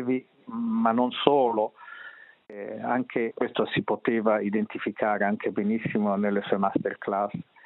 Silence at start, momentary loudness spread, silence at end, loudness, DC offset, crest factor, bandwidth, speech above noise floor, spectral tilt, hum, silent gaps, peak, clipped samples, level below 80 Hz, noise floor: 0 s; 14 LU; 0.25 s; -27 LUFS; under 0.1%; 24 dB; 4.1 kHz; 21 dB; -4.5 dB/octave; none; none; -2 dBFS; under 0.1%; -70 dBFS; -47 dBFS